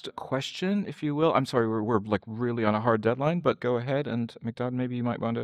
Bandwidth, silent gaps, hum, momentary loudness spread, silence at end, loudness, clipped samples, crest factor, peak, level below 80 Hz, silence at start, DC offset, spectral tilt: 12.5 kHz; none; none; 7 LU; 0 s; -28 LUFS; under 0.1%; 18 dB; -10 dBFS; -64 dBFS; 0.05 s; under 0.1%; -7 dB/octave